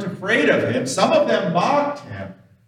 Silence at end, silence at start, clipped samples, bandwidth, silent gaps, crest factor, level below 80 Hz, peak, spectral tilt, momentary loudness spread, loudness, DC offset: 0.35 s; 0 s; under 0.1%; 13.5 kHz; none; 16 dB; -68 dBFS; -4 dBFS; -4.5 dB/octave; 17 LU; -18 LUFS; under 0.1%